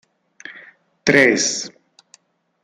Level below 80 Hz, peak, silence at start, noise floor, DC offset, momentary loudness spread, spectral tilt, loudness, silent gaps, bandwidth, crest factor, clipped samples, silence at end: -62 dBFS; -2 dBFS; 0.45 s; -55 dBFS; under 0.1%; 25 LU; -2.5 dB/octave; -16 LUFS; none; 14.5 kHz; 20 dB; under 0.1%; 0.95 s